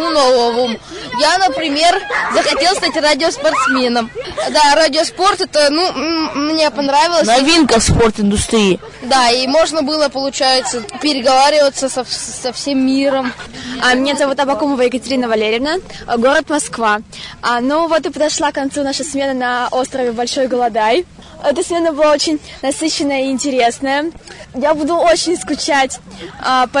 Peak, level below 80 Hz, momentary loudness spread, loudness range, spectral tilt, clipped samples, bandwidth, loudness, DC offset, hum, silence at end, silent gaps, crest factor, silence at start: 0 dBFS; -38 dBFS; 9 LU; 4 LU; -3 dB/octave; under 0.1%; 11 kHz; -14 LUFS; under 0.1%; none; 0 s; none; 14 dB; 0 s